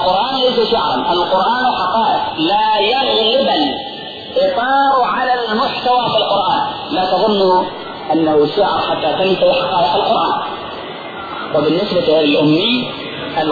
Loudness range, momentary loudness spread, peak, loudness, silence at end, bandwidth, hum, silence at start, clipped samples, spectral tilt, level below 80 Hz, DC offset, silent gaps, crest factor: 2 LU; 11 LU; -4 dBFS; -14 LUFS; 0 s; 4.9 kHz; none; 0 s; under 0.1%; -6.5 dB/octave; -48 dBFS; under 0.1%; none; 12 dB